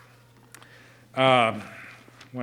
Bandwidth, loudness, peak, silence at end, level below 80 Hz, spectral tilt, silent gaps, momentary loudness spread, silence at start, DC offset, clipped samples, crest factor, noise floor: 15 kHz; -22 LUFS; -4 dBFS; 0 s; -72 dBFS; -5 dB/octave; none; 24 LU; 1.15 s; under 0.1%; under 0.1%; 24 dB; -54 dBFS